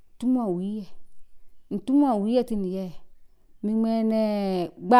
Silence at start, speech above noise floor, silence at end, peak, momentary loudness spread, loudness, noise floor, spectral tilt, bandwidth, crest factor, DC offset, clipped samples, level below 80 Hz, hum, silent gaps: 0.2 s; 26 dB; 0 s; -6 dBFS; 12 LU; -26 LUFS; -49 dBFS; -8 dB/octave; 12.5 kHz; 18 dB; under 0.1%; under 0.1%; -54 dBFS; none; none